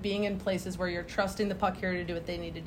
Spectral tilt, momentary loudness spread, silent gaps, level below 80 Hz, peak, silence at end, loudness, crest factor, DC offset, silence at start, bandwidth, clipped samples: -5.5 dB/octave; 5 LU; none; -50 dBFS; -14 dBFS; 0 s; -32 LUFS; 18 dB; under 0.1%; 0 s; 16 kHz; under 0.1%